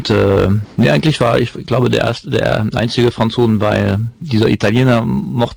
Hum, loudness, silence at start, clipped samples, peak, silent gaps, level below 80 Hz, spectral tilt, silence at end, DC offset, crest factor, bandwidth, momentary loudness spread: none; -14 LUFS; 0 s; under 0.1%; -4 dBFS; none; -38 dBFS; -7 dB/octave; 0 s; under 0.1%; 10 dB; over 20 kHz; 5 LU